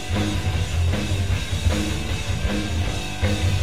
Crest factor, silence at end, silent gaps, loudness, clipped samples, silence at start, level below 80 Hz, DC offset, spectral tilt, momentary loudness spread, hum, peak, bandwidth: 14 dB; 0 s; none; -24 LUFS; under 0.1%; 0 s; -28 dBFS; 2%; -5 dB/octave; 3 LU; none; -8 dBFS; 15.5 kHz